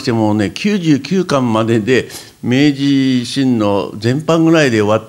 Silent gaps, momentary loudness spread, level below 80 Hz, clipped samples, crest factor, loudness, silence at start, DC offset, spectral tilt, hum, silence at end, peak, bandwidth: none; 6 LU; -54 dBFS; under 0.1%; 12 dB; -14 LUFS; 0 s; under 0.1%; -6 dB/octave; none; 0 s; 0 dBFS; 15.5 kHz